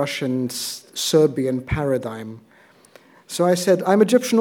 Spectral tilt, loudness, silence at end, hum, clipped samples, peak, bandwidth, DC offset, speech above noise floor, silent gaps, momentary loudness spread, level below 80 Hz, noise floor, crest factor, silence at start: -5 dB/octave; -20 LUFS; 0 s; none; under 0.1%; -4 dBFS; 19 kHz; under 0.1%; 31 dB; none; 14 LU; -46 dBFS; -51 dBFS; 18 dB; 0 s